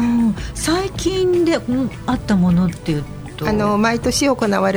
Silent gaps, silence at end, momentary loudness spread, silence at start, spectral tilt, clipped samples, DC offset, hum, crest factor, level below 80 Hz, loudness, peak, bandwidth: none; 0 s; 7 LU; 0 s; -5.5 dB/octave; under 0.1%; under 0.1%; none; 14 dB; -34 dBFS; -18 LUFS; -4 dBFS; over 20 kHz